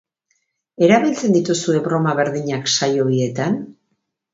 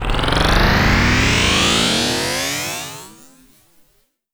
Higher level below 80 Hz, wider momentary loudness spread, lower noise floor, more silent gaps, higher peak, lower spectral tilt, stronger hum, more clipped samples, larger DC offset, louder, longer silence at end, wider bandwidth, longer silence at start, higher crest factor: second, -60 dBFS vs -24 dBFS; second, 8 LU vs 11 LU; first, -72 dBFS vs -61 dBFS; neither; about the same, 0 dBFS vs 0 dBFS; first, -5 dB/octave vs -3.5 dB/octave; neither; neither; neither; second, -18 LUFS vs -15 LUFS; second, 0.6 s vs 1.25 s; second, 8 kHz vs over 20 kHz; first, 0.8 s vs 0 s; about the same, 18 dB vs 18 dB